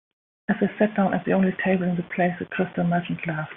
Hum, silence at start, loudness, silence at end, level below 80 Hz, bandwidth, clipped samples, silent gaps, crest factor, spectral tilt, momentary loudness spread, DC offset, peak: none; 0.5 s; -24 LUFS; 0 s; -60 dBFS; 3.8 kHz; under 0.1%; none; 18 dB; -6.5 dB/octave; 7 LU; under 0.1%; -6 dBFS